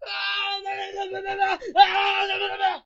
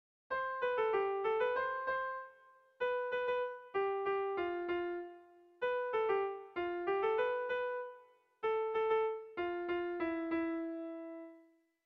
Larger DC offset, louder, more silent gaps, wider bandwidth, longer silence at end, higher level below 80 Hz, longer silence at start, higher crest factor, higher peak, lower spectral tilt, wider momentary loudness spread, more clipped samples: neither; first, -23 LUFS vs -37 LUFS; neither; first, 7.6 kHz vs 6 kHz; second, 0.05 s vs 0.45 s; first, -60 dBFS vs -74 dBFS; second, 0 s vs 0.3 s; first, 22 dB vs 14 dB; first, -2 dBFS vs -22 dBFS; about the same, -1.5 dB/octave vs -2 dB/octave; first, 13 LU vs 10 LU; neither